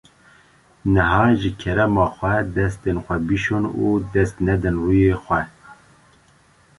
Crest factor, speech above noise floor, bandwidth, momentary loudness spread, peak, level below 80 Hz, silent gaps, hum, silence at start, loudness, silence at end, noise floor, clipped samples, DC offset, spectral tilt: 18 dB; 36 dB; 11.5 kHz; 7 LU; -2 dBFS; -36 dBFS; none; none; 0.85 s; -20 LUFS; 1.05 s; -55 dBFS; under 0.1%; under 0.1%; -8 dB/octave